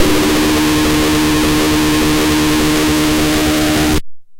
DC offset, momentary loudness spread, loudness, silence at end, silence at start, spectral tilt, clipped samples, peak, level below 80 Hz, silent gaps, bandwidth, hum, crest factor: under 0.1%; 1 LU; -12 LUFS; 0 s; 0 s; -4 dB/octave; under 0.1%; 0 dBFS; -26 dBFS; none; 17 kHz; none; 12 dB